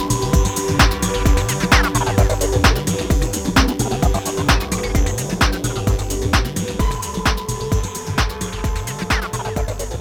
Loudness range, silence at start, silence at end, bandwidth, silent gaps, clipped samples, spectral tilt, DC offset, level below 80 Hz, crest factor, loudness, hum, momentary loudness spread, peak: 5 LU; 0 s; 0 s; over 20 kHz; none; under 0.1%; -4.5 dB/octave; 0.2%; -22 dBFS; 16 dB; -19 LUFS; none; 8 LU; 0 dBFS